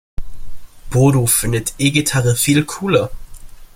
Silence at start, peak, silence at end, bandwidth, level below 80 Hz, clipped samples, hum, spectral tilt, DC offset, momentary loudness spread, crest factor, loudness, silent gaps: 0.2 s; 0 dBFS; 0.1 s; 16.5 kHz; -34 dBFS; under 0.1%; none; -4.5 dB/octave; under 0.1%; 7 LU; 16 dB; -15 LUFS; none